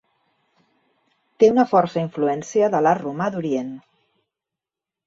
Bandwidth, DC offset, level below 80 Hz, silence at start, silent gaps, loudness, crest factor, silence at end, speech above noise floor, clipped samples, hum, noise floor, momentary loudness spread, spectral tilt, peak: 7.8 kHz; under 0.1%; -66 dBFS; 1.4 s; none; -20 LUFS; 18 dB; 1.25 s; 69 dB; under 0.1%; none; -88 dBFS; 10 LU; -6.5 dB/octave; -4 dBFS